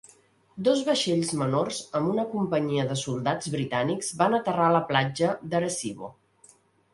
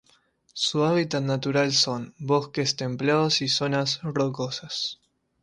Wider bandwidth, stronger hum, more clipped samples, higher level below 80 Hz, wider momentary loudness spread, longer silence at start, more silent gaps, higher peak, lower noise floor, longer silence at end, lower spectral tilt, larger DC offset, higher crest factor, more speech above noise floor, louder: about the same, 11.5 kHz vs 11.5 kHz; neither; neither; about the same, -64 dBFS vs -64 dBFS; about the same, 6 LU vs 8 LU; about the same, 0.55 s vs 0.55 s; neither; first, -6 dBFS vs -10 dBFS; second, -59 dBFS vs -63 dBFS; first, 0.85 s vs 0.5 s; about the same, -5 dB/octave vs -4 dB/octave; neither; about the same, 20 dB vs 16 dB; second, 33 dB vs 38 dB; about the same, -26 LUFS vs -25 LUFS